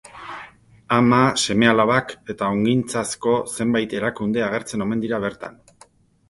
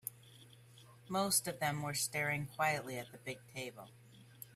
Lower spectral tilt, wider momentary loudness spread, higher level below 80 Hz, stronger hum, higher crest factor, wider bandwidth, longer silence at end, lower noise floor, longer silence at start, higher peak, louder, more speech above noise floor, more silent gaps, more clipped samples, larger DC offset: first, -5 dB/octave vs -3 dB/octave; first, 19 LU vs 15 LU; first, -54 dBFS vs -74 dBFS; neither; about the same, 20 dB vs 22 dB; second, 11.5 kHz vs 16 kHz; first, 0.8 s vs 0 s; second, -53 dBFS vs -60 dBFS; about the same, 0.15 s vs 0.05 s; first, 0 dBFS vs -18 dBFS; first, -20 LUFS vs -37 LUFS; first, 33 dB vs 22 dB; neither; neither; neither